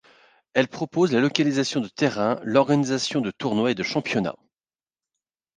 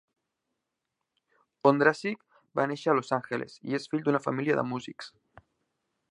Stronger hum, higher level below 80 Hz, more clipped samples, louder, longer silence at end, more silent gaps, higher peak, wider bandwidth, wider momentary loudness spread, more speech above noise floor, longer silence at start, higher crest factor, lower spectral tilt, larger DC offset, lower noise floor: neither; first, -66 dBFS vs -74 dBFS; neither; first, -23 LUFS vs -28 LUFS; first, 1.25 s vs 1 s; neither; first, -2 dBFS vs -6 dBFS; second, 9.8 kHz vs 11 kHz; second, 6 LU vs 14 LU; first, over 67 dB vs 56 dB; second, 0.55 s vs 1.65 s; about the same, 22 dB vs 24 dB; second, -5 dB/octave vs -6.5 dB/octave; neither; first, under -90 dBFS vs -85 dBFS